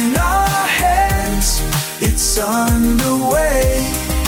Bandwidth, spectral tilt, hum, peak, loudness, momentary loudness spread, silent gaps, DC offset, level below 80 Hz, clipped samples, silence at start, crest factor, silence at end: 19 kHz; -4 dB/octave; none; -4 dBFS; -15 LUFS; 3 LU; none; under 0.1%; -22 dBFS; under 0.1%; 0 s; 12 dB; 0 s